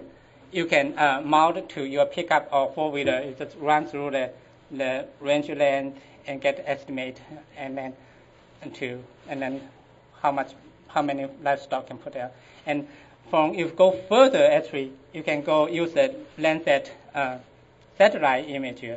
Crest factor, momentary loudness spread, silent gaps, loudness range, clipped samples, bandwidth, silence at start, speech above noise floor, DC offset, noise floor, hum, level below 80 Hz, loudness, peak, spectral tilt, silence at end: 22 dB; 17 LU; none; 11 LU; under 0.1%; 8 kHz; 0 s; 29 dB; under 0.1%; -53 dBFS; none; -66 dBFS; -24 LUFS; -4 dBFS; -5 dB/octave; 0 s